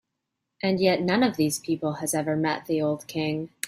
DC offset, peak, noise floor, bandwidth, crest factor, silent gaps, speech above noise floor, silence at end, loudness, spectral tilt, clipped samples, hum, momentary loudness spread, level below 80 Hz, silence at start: under 0.1%; -8 dBFS; -82 dBFS; 16 kHz; 18 dB; none; 57 dB; 0 s; -26 LUFS; -5 dB/octave; under 0.1%; none; 6 LU; -66 dBFS; 0.65 s